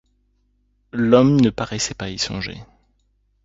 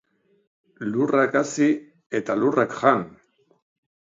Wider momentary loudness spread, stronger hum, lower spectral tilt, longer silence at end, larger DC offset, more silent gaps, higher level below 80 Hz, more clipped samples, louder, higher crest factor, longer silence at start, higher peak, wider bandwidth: first, 17 LU vs 10 LU; first, 50 Hz at -45 dBFS vs none; about the same, -5.5 dB/octave vs -5.5 dB/octave; second, 0.8 s vs 1.05 s; neither; second, none vs 2.06-2.10 s; first, -48 dBFS vs -70 dBFS; neither; first, -19 LUFS vs -22 LUFS; about the same, 20 dB vs 22 dB; first, 0.95 s vs 0.8 s; first, 0 dBFS vs -4 dBFS; about the same, 7.8 kHz vs 7.8 kHz